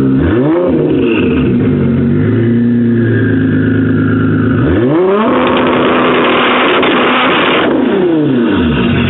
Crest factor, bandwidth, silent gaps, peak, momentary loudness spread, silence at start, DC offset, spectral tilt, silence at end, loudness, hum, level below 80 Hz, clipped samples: 10 dB; 4.1 kHz; none; 0 dBFS; 2 LU; 0 s; under 0.1%; -5 dB/octave; 0 s; -10 LUFS; none; -32 dBFS; under 0.1%